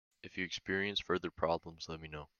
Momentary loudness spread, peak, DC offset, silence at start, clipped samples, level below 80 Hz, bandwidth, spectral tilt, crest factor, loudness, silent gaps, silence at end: 11 LU; -16 dBFS; under 0.1%; 0.25 s; under 0.1%; -64 dBFS; 7.2 kHz; -4.5 dB/octave; 22 dB; -38 LUFS; none; 0.15 s